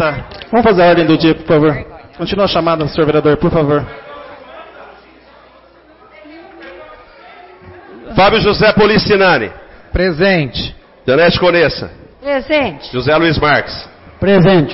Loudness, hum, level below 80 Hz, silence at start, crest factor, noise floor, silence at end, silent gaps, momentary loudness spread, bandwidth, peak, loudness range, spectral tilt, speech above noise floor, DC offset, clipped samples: -12 LUFS; none; -34 dBFS; 0 s; 12 dB; -44 dBFS; 0 s; none; 19 LU; 5.8 kHz; -2 dBFS; 6 LU; -9.5 dB/octave; 32 dB; under 0.1%; under 0.1%